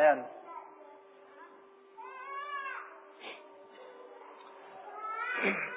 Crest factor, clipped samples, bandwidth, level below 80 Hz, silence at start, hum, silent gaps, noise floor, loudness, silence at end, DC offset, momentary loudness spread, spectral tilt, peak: 24 dB; under 0.1%; 4 kHz; under -90 dBFS; 0 s; none; none; -57 dBFS; -37 LUFS; 0 s; under 0.1%; 23 LU; -2 dB/octave; -14 dBFS